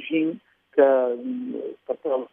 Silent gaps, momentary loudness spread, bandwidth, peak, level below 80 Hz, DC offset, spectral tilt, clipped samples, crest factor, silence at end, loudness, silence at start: none; 14 LU; 3.7 kHz; -6 dBFS; -84 dBFS; under 0.1%; -9 dB/octave; under 0.1%; 18 dB; 0.05 s; -24 LUFS; 0 s